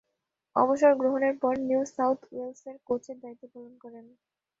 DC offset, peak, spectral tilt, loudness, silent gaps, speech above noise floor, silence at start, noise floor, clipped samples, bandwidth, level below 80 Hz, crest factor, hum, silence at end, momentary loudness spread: under 0.1%; -8 dBFS; -6 dB/octave; -26 LUFS; none; 55 dB; 0.55 s; -83 dBFS; under 0.1%; 7.8 kHz; -74 dBFS; 20 dB; none; 0.6 s; 25 LU